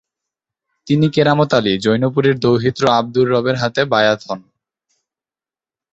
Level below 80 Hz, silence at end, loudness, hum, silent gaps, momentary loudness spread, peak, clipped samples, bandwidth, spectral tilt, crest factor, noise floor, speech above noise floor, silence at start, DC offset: -54 dBFS; 1.55 s; -15 LUFS; none; none; 5 LU; -2 dBFS; under 0.1%; 8.2 kHz; -6.5 dB/octave; 16 dB; under -90 dBFS; over 75 dB; 0.85 s; under 0.1%